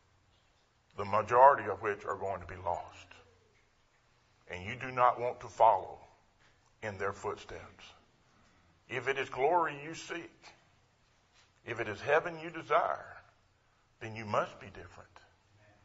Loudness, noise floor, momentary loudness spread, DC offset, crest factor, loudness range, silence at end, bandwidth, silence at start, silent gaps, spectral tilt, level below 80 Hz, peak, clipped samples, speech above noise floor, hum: -32 LUFS; -70 dBFS; 23 LU; under 0.1%; 26 dB; 9 LU; 0.85 s; 7.6 kHz; 0.95 s; none; -3 dB/octave; -68 dBFS; -8 dBFS; under 0.1%; 38 dB; none